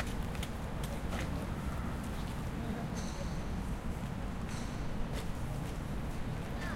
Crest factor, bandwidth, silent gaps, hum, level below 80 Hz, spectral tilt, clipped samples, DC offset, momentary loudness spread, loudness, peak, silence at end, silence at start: 14 dB; 16.5 kHz; none; none; -42 dBFS; -6 dB/octave; under 0.1%; under 0.1%; 2 LU; -40 LUFS; -24 dBFS; 0 s; 0 s